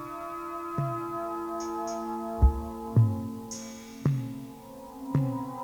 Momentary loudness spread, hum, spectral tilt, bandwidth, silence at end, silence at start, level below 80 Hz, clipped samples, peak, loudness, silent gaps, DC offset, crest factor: 15 LU; none; -7.5 dB/octave; over 20 kHz; 0 s; 0 s; -36 dBFS; under 0.1%; -10 dBFS; -31 LUFS; none; under 0.1%; 20 dB